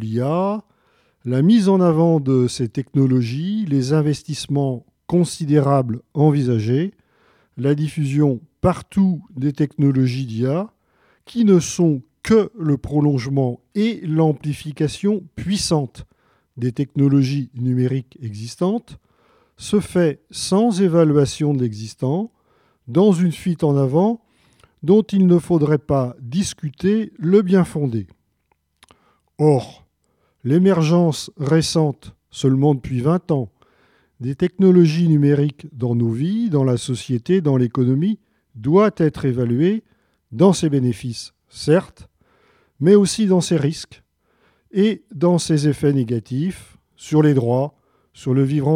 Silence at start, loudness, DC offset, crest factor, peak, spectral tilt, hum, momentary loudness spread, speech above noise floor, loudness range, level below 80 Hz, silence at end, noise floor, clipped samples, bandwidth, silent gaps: 0 s; -19 LUFS; under 0.1%; 16 dB; -2 dBFS; -7 dB/octave; none; 11 LU; 50 dB; 4 LU; -50 dBFS; 0 s; -67 dBFS; under 0.1%; 13.5 kHz; none